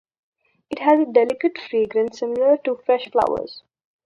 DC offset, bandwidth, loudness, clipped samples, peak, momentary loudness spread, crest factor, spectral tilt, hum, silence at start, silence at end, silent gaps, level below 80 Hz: under 0.1%; 8.2 kHz; -20 LUFS; under 0.1%; -2 dBFS; 7 LU; 18 dB; -5.5 dB/octave; none; 0.7 s; 0.45 s; none; -62 dBFS